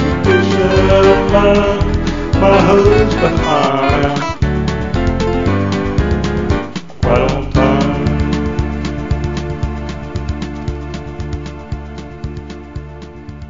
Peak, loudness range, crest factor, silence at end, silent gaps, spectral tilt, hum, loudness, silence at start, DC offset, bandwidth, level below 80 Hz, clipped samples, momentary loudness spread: 0 dBFS; 13 LU; 14 dB; 0 s; none; -7 dB/octave; none; -14 LUFS; 0 s; 2%; 7.6 kHz; -22 dBFS; under 0.1%; 17 LU